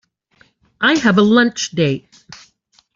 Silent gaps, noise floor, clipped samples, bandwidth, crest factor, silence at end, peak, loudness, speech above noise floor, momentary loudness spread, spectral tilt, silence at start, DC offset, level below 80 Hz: none; -57 dBFS; under 0.1%; 7.6 kHz; 16 dB; 0.6 s; -2 dBFS; -15 LUFS; 42 dB; 7 LU; -4.5 dB/octave; 0.8 s; under 0.1%; -56 dBFS